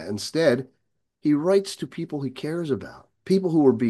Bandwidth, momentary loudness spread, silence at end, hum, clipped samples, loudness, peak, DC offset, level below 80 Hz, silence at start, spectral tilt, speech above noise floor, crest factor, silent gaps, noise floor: 12.5 kHz; 12 LU; 0 s; none; under 0.1%; -24 LUFS; -6 dBFS; under 0.1%; -68 dBFS; 0 s; -6.5 dB/octave; 49 dB; 18 dB; none; -72 dBFS